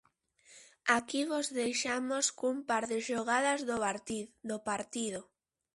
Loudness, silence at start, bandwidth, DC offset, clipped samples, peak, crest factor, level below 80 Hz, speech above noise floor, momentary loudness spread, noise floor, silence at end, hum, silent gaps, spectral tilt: -33 LUFS; 0.5 s; 11.5 kHz; under 0.1%; under 0.1%; -12 dBFS; 22 dB; -72 dBFS; 32 dB; 9 LU; -66 dBFS; 0.55 s; none; none; -2 dB/octave